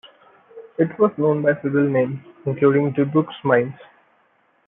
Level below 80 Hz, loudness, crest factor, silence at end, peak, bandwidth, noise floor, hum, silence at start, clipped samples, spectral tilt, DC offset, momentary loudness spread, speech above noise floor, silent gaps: -68 dBFS; -20 LUFS; 18 dB; 0.85 s; -2 dBFS; 3.8 kHz; -62 dBFS; none; 0.55 s; under 0.1%; -12 dB/octave; under 0.1%; 10 LU; 43 dB; none